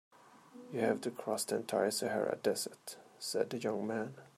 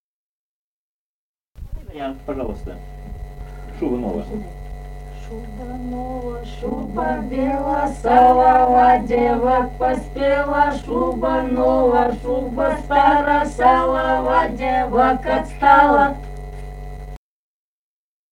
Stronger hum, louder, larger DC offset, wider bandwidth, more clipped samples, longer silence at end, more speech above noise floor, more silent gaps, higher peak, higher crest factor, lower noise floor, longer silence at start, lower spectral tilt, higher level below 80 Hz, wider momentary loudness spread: neither; second, -36 LUFS vs -17 LUFS; neither; about the same, 15.5 kHz vs 15.5 kHz; neither; second, 0.1 s vs 1.15 s; second, 21 dB vs over 73 dB; neither; second, -18 dBFS vs 0 dBFS; about the same, 20 dB vs 18 dB; second, -57 dBFS vs under -90 dBFS; second, 0.3 s vs 1.6 s; second, -3.5 dB/octave vs -6.5 dB/octave; second, -82 dBFS vs -34 dBFS; second, 10 LU vs 23 LU